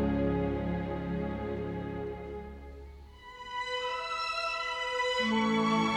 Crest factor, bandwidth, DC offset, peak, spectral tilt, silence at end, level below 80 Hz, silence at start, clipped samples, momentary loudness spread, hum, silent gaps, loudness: 16 dB; 10.5 kHz; under 0.1%; -18 dBFS; -5.5 dB/octave; 0 s; -46 dBFS; 0 s; under 0.1%; 19 LU; none; none; -32 LUFS